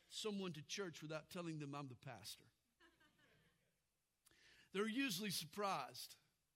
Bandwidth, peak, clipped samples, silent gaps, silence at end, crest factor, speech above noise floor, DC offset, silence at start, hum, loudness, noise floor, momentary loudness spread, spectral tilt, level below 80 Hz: 16 kHz; -30 dBFS; under 0.1%; none; 0.4 s; 20 dB; 41 dB; under 0.1%; 0.1 s; none; -47 LUFS; -89 dBFS; 13 LU; -4 dB/octave; -88 dBFS